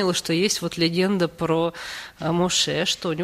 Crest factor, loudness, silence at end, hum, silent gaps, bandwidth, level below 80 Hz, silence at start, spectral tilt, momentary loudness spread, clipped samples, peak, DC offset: 16 dB; -22 LUFS; 0 s; none; none; 15.5 kHz; -54 dBFS; 0 s; -4 dB/octave; 8 LU; under 0.1%; -8 dBFS; under 0.1%